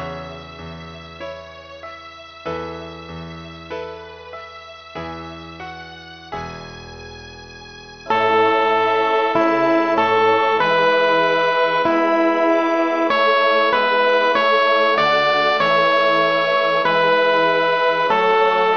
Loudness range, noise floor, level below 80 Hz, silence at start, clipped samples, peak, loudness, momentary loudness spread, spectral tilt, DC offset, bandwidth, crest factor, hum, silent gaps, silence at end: 17 LU; -38 dBFS; -52 dBFS; 0 s; under 0.1%; -2 dBFS; -16 LUFS; 20 LU; -5 dB/octave; under 0.1%; 6.6 kHz; 16 dB; none; none; 0 s